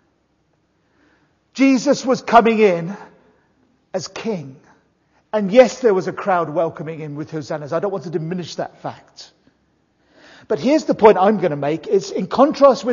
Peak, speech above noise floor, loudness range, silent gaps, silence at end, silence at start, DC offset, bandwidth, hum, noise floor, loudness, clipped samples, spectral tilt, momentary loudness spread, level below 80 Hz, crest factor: 0 dBFS; 47 dB; 8 LU; none; 0 s; 1.55 s; under 0.1%; 7.4 kHz; none; -64 dBFS; -17 LUFS; under 0.1%; -6 dB/octave; 17 LU; -60 dBFS; 18 dB